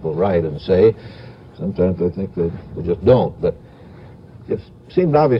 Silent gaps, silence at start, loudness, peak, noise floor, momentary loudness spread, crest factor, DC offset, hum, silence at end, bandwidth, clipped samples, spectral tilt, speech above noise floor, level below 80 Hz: none; 0 s; -19 LUFS; -2 dBFS; -40 dBFS; 17 LU; 18 dB; under 0.1%; none; 0 s; 5.8 kHz; under 0.1%; -10.5 dB/octave; 23 dB; -42 dBFS